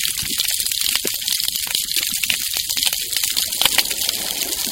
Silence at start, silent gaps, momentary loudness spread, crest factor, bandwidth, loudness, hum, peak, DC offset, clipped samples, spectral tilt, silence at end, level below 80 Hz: 0 s; none; 4 LU; 22 dB; 17 kHz; -18 LUFS; none; 0 dBFS; under 0.1%; under 0.1%; 1.5 dB/octave; 0 s; -48 dBFS